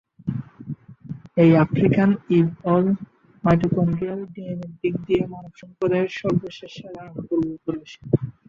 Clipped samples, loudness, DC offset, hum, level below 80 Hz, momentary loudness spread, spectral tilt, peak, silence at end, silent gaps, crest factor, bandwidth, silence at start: under 0.1%; -22 LUFS; under 0.1%; none; -52 dBFS; 19 LU; -9 dB/octave; -4 dBFS; 0.2 s; none; 18 dB; 7 kHz; 0.25 s